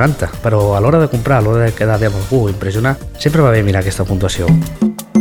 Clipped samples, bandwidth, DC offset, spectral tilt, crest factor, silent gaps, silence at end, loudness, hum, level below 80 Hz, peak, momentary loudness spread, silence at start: under 0.1%; 19.5 kHz; under 0.1%; -7 dB/octave; 12 dB; none; 0 s; -14 LUFS; none; -30 dBFS; 0 dBFS; 6 LU; 0 s